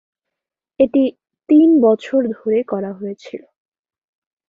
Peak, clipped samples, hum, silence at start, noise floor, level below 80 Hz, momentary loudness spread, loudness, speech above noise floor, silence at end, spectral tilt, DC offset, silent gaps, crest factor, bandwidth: -2 dBFS; under 0.1%; none; 0.8 s; -83 dBFS; -62 dBFS; 18 LU; -16 LUFS; 68 dB; 1.1 s; -8 dB/octave; under 0.1%; none; 16 dB; 7.2 kHz